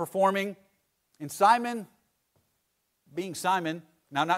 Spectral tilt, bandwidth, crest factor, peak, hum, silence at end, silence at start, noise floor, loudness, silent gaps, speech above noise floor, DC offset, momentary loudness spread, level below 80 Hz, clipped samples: -4 dB/octave; 16 kHz; 20 dB; -10 dBFS; none; 0 s; 0 s; -77 dBFS; -28 LUFS; none; 50 dB; under 0.1%; 18 LU; -78 dBFS; under 0.1%